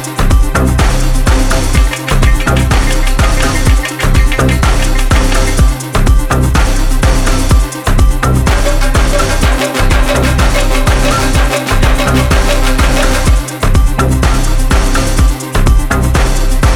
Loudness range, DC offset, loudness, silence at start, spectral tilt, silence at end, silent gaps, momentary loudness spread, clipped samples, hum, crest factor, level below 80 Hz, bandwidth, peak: 1 LU; under 0.1%; -12 LUFS; 0 s; -4.5 dB/octave; 0 s; none; 2 LU; under 0.1%; none; 8 dB; -10 dBFS; 16.5 kHz; 0 dBFS